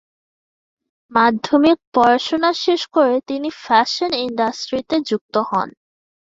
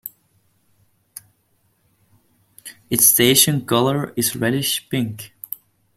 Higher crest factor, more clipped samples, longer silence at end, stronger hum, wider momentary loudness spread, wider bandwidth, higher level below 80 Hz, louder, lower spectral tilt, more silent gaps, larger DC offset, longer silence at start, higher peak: second, 16 dB vs 22 dB; neither; about the same, 0.7 s vs 0.7 s; neither; second, 7 LU vs 24 LU; second, 7.8 kHz vs 16.5 kHz; about the same, -60 dBFS vs -58 dBFS; about the same, -18 LUFS vs -17 LUFS; about the same, -4 dB/octave vs -3 dB/octave; first, 1.87-1.92 s, 5.21-5.29 s vs none; neither; first, 1.1 s vs 0.05 s; about the same, -2 dBFS vs 0 dBFS